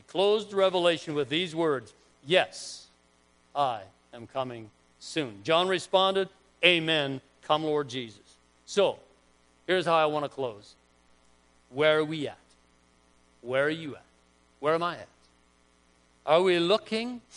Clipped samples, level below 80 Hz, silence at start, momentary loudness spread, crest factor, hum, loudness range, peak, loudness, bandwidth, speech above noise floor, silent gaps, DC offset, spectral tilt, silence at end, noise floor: under 0.1%; -72 dBFS; 0.15 s; 17 LU; 26 dB; none; 7 LU; -4 dBFS; -27 LUFS; 10.5 kHz; 37 dB; none; under 0.1%; -4.5 dB/octave; 0 s; -64 dBFS